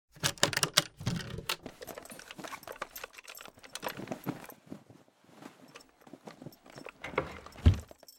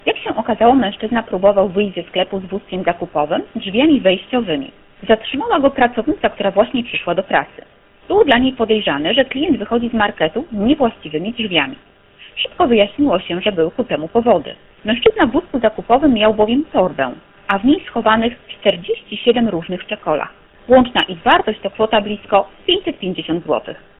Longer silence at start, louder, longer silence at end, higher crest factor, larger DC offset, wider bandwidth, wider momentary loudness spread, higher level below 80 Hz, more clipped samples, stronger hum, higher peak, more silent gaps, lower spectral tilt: about the same, 0.15 s vs 0.05 s; second, -34 LUFS vs -16 LUFS; second, 0.05 s vs 0.2 s; first, 32 dB vs 16 dB; neither; first, 17.5 kHz vs 4.1 kHz; first, 23 LU vs 9 LU; about the same, -44 dBFS vs -44 dBFS; neither; neither; second, -4 dBFS vs 0 dBFS; neither; second, -3.5 dB/octave vs -8 dB/octave